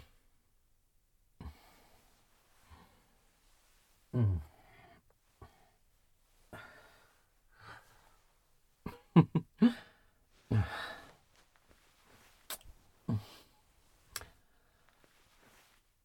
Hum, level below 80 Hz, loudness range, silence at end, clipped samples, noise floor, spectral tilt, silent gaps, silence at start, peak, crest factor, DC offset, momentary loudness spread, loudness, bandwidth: none; -60 dBFS; 24 LU; 1.8 s; under 0.1%; -72 dBFS; -7 dB/octave; none; 1.4 s; -10 dBFS; 30 dB; under 0.1%; 27 LU; -34 LUFS; 18 kHz